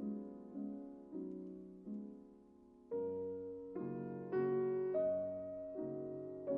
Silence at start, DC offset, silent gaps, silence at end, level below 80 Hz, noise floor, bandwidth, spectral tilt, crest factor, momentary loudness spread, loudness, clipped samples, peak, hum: 0 s; under 0.1%; none; 0 s; -78 dBFS; -63 dBFS; 3.2 kHz; -9.5 dB/octave; 16 dB; 14 LU; -43 LUFS; under 0.1%; -28 dBFS; none